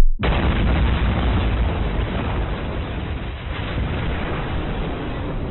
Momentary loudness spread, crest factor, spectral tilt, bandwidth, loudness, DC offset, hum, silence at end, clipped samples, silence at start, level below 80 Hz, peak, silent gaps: 8 LU; 16 dB; -5.5 dB/octave; 4.2 kHz; -23 LUFS; under 0.1%; none; 0 s; under 0.1%; 0 s; -24 dBFS; -4 dBFS; none